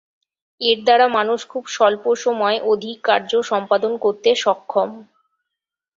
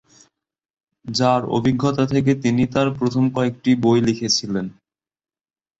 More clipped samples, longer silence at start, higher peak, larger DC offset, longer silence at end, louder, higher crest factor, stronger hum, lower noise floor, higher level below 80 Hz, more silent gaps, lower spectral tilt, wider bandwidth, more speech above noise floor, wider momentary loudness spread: neither; second, 0.6 s vs 1.05 s; first, 0 dBFS vs -4 dBFS; neither; about the same, 0.95 s vs 1.05 s; about the same, -18 LUFS vs -19 LUFS; about the same, 18 dB vs 16 dB; neither; second, -84 dBFS vs under -90 dBFS; second, -68 dBFS vs -52 dBFS; neither; second, -3 dB/octave vs -5.5 dB/octave; about the same, 7.8 kHz vs 8 kHz; second, 66 dB vs over 71 dB; about the same, 7 LU vs 9 LU